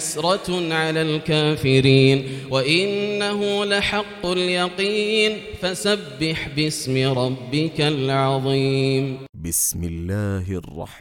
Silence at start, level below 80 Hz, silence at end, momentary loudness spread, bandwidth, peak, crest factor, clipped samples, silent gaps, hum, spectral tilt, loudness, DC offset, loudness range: 0 s; -46 dBFS; 0 s; 8 LU; 18 kHz; -2 dBFS; 20 dB; under 0.1%; 9.29-9.33 s; none; -4.5 dB/octave; -21 LUFS; under 0.1%; 3 LU